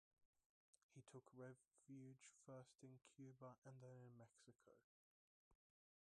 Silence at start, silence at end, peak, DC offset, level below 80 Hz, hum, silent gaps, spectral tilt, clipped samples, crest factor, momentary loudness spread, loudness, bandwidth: 0.2 s; 0.55 s; -48 dBFS; under 0.1%; under -90 dBFS; none; 0.25-0.33 s, 0.46-0.73 s, 0.83-0.89 s, 3.58-3.62 s, 4.84-5.51 s; -6 dB/octave; under 0.1%; 18 dB; 4 LU; -65 LUFS; 11 kHz